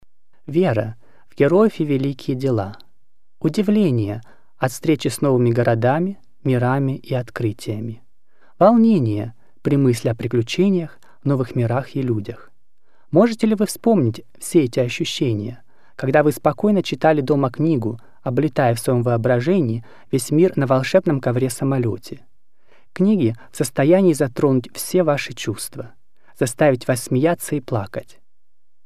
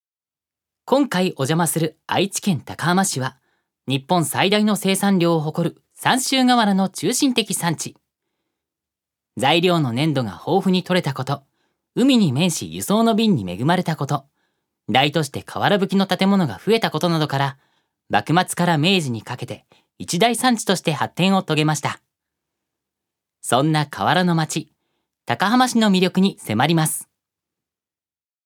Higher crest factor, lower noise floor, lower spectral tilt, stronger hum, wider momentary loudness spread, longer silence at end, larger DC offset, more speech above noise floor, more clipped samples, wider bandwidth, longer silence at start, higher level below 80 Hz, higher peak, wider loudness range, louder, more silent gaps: about the same, 18 dB vs 20 dB; second, -78 dBFS vs under -90 dBFS; first, -6.5 dB/octave vs -4.5 dB/octave; neither; about the same, 11 LU vs 11 LU; second, 0.85 s vs 1.45 s; first, 1% vs under 0.1%; second, 60 dB vs over 71 dB; neither; second, 15.5 kHz vs 18 kHz; second, 0 s vs 0.85 s; first, -60 dBFS vs -66 dBFS; about the same, -2 dBFS vs -2 dBFS; about the same, 3 LU vs 3 LU; about the same, -19 LUFS vs -19 LUFS; neither